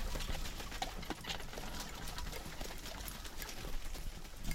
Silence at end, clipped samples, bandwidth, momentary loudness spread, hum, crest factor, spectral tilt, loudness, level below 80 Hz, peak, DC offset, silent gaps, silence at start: 0 s; under 0.1%; 16.5 kHz; 5 LU; none; 20 dB; -3 dB/octave; -45 LUFS; -44 dBFS; -22 dBFS; under 0.1%; none; 0 s